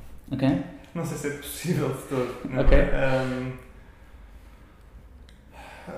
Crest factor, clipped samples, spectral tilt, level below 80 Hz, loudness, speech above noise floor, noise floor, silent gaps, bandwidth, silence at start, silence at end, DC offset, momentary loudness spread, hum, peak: 20 dB; under 0.1%; -6.5 dB/octave; -30 dBFS; -27 LUFS; 26 dB; -49 dBFS; none; 15.5 kHz; 0 s; 0 s; under 0.1%; 16 LU; none; -6 dBFS